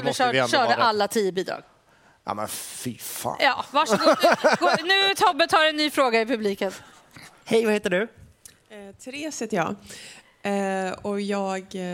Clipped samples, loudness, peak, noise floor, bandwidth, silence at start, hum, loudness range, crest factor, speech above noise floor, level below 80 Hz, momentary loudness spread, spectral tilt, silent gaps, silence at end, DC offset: under 0.1%; -23 LUFS; -4 dBFS; -58 dBFS; 17 kHz; 0 s; none; 9 LU; 20 dB; 35 dB; -66 dBFS; 15 LU; -3.5 dB/octave; none; 0 s; under 0.1%